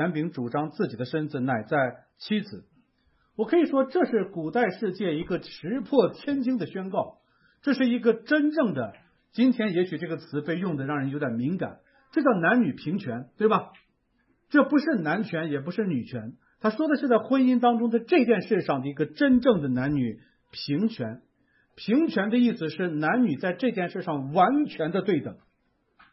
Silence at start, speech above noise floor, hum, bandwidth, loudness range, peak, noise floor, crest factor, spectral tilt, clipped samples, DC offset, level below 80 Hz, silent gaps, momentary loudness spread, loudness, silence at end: 0 s; 46 dB; none; 5.8 kHz; 4 LU; -6 dBFS; -71 dBFS; 20 dB; -10.5 dB/octave; under 0.1%; under 0.1%; -64 dBFS; none; 11 LU; -26 LUFS; 0.75 s